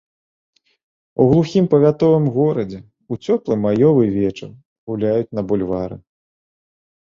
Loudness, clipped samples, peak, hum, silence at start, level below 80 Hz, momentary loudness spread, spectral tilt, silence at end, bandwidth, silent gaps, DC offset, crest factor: -17 LUFS; under 0.1%; -2 dBFS; none; 1.2 s; -50 dBFS; 17 LU; -9 dB/octave; 1 s; 7.4 kHz; 4.65-4.87 s; under 0.1%; 16 dB